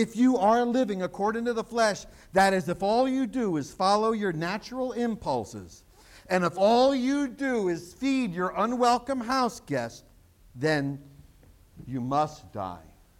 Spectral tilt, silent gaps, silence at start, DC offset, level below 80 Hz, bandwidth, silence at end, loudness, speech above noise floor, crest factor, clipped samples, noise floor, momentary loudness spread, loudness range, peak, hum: -5.5 dB/octave; none; 0 s; under 0.1%; -58 dBFS; 15.5 kHz; 0.4 s; -27 LUFS; 29 dB; 18 dB; under 0.1%; -56 dBFS; 12 LU; 5 LU; -10 dBFS; none